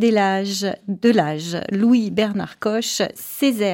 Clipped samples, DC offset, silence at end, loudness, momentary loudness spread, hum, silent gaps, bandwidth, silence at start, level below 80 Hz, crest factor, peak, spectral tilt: under 0.1%; under 0.1%; 0 s; -20 LUFS; 7 LU; none; none; 17 kHz; 0 s; -62 dBFS; 16 dB; -4 dBFS; -4.5 dB/octave